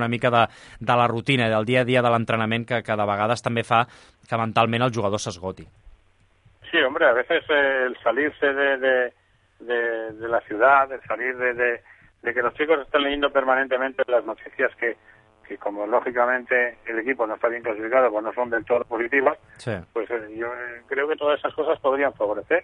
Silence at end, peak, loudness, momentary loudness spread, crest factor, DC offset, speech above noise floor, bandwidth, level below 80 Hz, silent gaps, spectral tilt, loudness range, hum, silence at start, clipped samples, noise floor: 0 s; -4 dBFS; -23 LUFS; 10 LU; 18 dB; under 0.1%; 37 dB; 11 kHz; -58 dBFS; none; -5.5 dB/octave; 4 LU; none; 0 s; under 0.1%; -60 dBFS